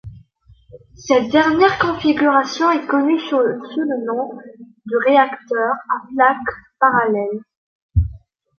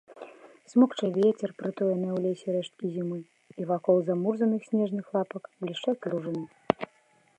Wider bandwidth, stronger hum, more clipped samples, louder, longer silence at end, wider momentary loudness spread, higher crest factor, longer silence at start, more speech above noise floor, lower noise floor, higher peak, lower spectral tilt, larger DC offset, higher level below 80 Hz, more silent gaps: second, 6.8 kHz vs 8.8 kHz; neither; neither; first, -17 LUFS vs -29 LUFS; about the same, 0.45 s vs 0.55 s; about the same, 12 LU vs 13 LU; second, 16 dB vs 26 dB; about the same, 0.05 s vs 0.1 s; second, 33 dB vs 37 dB; second, -50 dBFS vs -64 dBFS; about the same, -2 dBFS vs -2 dBFS; second, -6 dB/octave vs -7.5 dB/octave; neither; first, -36 dBFS vs -76 dBFS; first, 7.57-7.89 s vs none